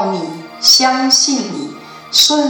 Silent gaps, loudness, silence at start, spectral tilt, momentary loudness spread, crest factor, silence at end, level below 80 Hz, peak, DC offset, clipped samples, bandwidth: none; -11 LUFS; 0 s; -1.5 dB/octave; 18 LU; 12 dB; 0 s; -64 dBFS; -2 dBFS; under 0.1%; under 0.1%; 19.5 kHz